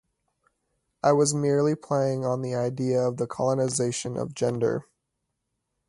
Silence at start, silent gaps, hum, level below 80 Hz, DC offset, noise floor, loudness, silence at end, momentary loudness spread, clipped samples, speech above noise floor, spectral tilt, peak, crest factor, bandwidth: 1.05 s; none; none; -64 dBFS; under 0.1%; -80 dBFS; -26 LUFS; 1.05 s; 6 LU; under 0.1%; 55 dB; -5.5 dB/octave; -8 dBFS; 20 dB; 11.5 kHz